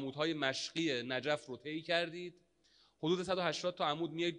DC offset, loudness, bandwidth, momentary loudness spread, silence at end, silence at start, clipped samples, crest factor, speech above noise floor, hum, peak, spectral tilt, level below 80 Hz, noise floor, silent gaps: under 0.1%; -37 LUFS; 10.5 kHz; 8 LU; 0 s; 0 s; under 0.1%; 20 dB; 34 dB; none; -18 dBFS; -4.5 dB/octave; -78 dBFS; -71 dBFS; none